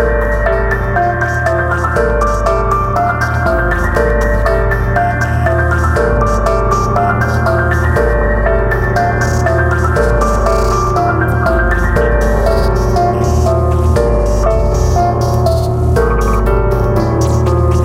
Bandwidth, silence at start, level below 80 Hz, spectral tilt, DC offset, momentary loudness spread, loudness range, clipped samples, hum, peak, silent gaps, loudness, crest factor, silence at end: 15.5 kHz; 0 s; -16 dBFS; -7 dB/octave; under 0.1%; 1 LU; 1 LU; under 0.1%; none; 0 dBFS; none; -13 LUFS; 10 dB; 0 s